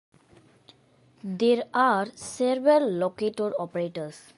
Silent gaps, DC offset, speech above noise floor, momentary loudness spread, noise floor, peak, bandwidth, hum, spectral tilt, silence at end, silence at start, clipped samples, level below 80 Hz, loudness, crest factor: none; under 0.1%; 35 dB; 13 LU; -60 dBFS; -8 dBFS; 11.5 kHz; none; -5 dB/octave; 0.2 s; 1.25 s; under 0.1%; -72 dBFS; -25 LUFS; 18 dB